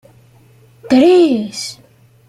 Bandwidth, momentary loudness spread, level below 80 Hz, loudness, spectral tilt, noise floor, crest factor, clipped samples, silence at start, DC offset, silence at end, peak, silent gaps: 12.5 kHz; 16 LU; -58 dBFS; -12 LUFS; -4.5 dB/octave; -47 dBFS; 14 dB; under 0.1%; 0.85 s; under 0.1%; 0.55 s; -2 dBFS; none